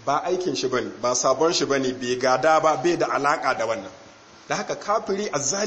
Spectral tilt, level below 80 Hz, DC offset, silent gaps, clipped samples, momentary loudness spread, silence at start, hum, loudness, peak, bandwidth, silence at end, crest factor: -3 dB/octave; -60 dBFS; under 0.1%; none; under 0.1%; 9 LU; 0 s; none; -23 LUFS; -6 dBFS; 8.6 kHz; 0 s; 18 dB